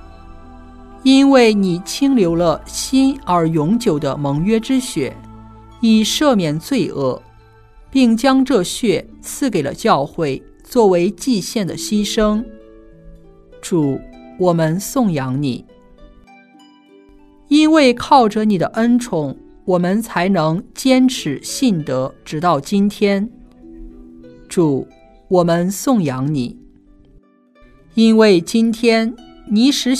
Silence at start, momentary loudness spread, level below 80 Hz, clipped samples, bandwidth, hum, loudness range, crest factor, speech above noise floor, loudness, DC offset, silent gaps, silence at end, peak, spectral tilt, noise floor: 0.05 s; 10 LU; -44 dBFS; under 0.1%; 14 kHz; none; 5 LU; 16 dB; 35 dB; -16 LUFS; under 0.1%; none; 0 s; 0 dBFS; -5.5 dB/octave; -50 dBFS